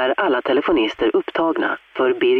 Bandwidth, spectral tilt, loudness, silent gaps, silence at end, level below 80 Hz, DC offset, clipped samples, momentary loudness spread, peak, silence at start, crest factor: 6.4 kHz; -6 dB/octave; -19 LUFS; none; 0 s; -52 dBFS; under 0.1%; under 0.1%; 3 LU; -8 dBFS; 0 s; 10 dB